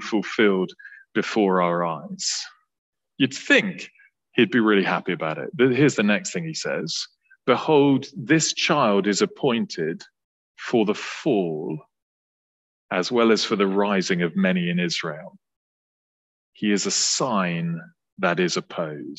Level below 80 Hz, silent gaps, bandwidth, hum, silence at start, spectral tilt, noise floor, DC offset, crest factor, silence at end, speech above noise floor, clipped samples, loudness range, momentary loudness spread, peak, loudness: -70 dBFS; 2.78-2.93 s, 10.24-10.55 s, 12.02-12.89 s, 15.56-16.53 s, 18.12-18.17 s; 9 kHz; none; 0 s; -4 dB/octave; under -90 dBFS; under 0.1%; 20 dB; 0.05 s; over 68 dB; under 0.1%; 4 LU; 11 LU; -4 dBFS; -22 LUFS